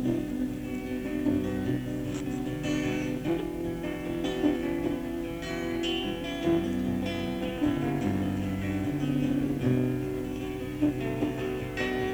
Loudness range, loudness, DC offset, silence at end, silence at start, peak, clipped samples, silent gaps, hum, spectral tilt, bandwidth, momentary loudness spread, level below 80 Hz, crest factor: 2 LU; -30 LUFS; under 0.1%; 0 s; 0 s; -14 dBFS; under 0.1%; none; none; -6.5 dB/octave; over 20 kHz; 6 LU; -46 dBFS; 16 dB